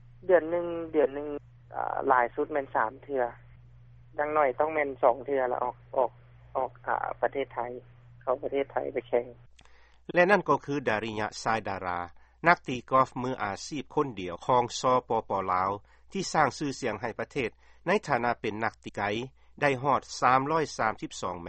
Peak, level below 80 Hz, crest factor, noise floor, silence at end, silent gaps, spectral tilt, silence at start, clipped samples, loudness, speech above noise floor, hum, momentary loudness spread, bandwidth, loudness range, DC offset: -4 dBFS; -58 dBFS; 24 dB; -56 dBFS; 0 s; none; -5 dB/octave; 0.25 s; under 0.1%; -29 LUFS; 27 dB; none; 11 LU; 8.4 kHz; 4 LU; under 0.1%